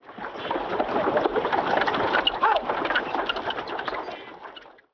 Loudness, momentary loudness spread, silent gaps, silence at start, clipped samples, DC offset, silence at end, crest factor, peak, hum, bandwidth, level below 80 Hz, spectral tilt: -25 LUFS; 16 LU; none; 0.05 s; under 0.1%; under 0.1%; 0.25 s; 18 dB; -8 dBFS; none; 5.4 kHz; -56 dBFS; -5 dB/octave